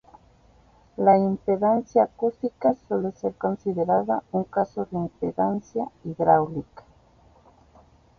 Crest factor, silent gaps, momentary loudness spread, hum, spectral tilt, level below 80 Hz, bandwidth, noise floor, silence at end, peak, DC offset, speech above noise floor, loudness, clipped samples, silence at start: 20 dB; none; 10 LU; none; -9.5 dB/octave; -58 dBFS; 6.6 kHz; -56 dBFS; 1.4 s; -6 dBFS; under 0.1%; 33 dB; -24 LUFS; under 0.1%; 1 s